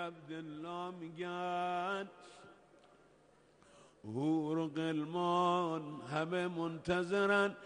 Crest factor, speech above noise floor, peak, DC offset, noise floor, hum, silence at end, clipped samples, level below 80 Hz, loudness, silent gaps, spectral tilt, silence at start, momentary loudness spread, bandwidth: 18 dB; 30 dB; -20 dBFS; under 0.1%; -67 dBFS; none; 0 s; under 0.1%; -74 dBFS; -37 LUFS; none; -6 dB/octave; 0 s; 14 LU; 10 kHz